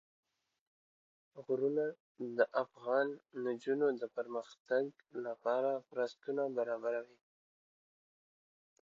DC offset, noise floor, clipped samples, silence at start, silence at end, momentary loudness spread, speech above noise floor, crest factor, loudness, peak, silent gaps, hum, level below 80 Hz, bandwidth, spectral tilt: under 0.1%; under -90 dBFS; under 0.1%; 1.35 s; 1.9 s; 9 LU; over 53 dB; 20 dB; -37 LUFS; -18 dBFS; 2.00-2.15 s, 4.60-4.65 s; none; under -90 dBFS; 7.4 kHz; -4 dB/octave